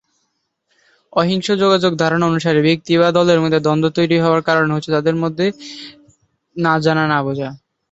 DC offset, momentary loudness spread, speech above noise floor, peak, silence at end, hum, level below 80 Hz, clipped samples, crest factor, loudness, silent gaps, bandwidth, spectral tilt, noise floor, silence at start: under 0.1%; 11 LU; 54 dB; -2 dBFS; 0.35 s; none; -56 dBFS; under 0.1%; 16 dB; -16 LUFS; none; 8 kHz; -6 dB/octave; -70 dBFS; 1.15 s